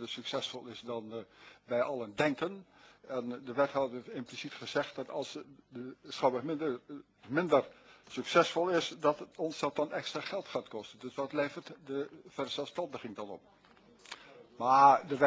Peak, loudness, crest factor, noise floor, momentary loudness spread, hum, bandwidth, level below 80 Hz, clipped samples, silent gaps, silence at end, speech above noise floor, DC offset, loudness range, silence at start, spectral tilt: -10 dBFS; -34 LUFS; 24 dB; -61 dBFS; 18 LU; none; 8 kHz; -76 dBFS; under 0.1%; none; 0 s; 27 dB; under 0.1%; 7 LU; 0 s; -4.5 dB/octave